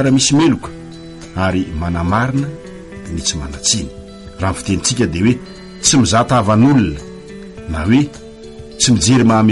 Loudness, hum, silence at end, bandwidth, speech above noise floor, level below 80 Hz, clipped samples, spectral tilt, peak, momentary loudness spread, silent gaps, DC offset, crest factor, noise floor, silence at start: -15 LUFS; none; 0 s; 11.5 kHz; 20 dB; -34 dBFS; under 0.1%; -4.5 dB/octave; 0 dBFS; 22 LU; none; under 0.1%; 16 dB; -33 dBFS; 0 s